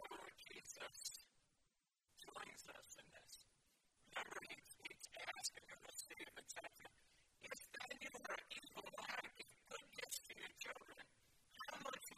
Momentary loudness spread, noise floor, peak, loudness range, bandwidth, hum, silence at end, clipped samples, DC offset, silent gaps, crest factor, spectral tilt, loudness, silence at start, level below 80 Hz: 12 LU; -86 dBFS; -30 dBFS; 5 LU; 14.5 kHz; none; 0 s; under 0.1%; under 0.1%; none; 26 dB; -0.5 dB/octave; -53 LUFS; 0 s; -84 dBFS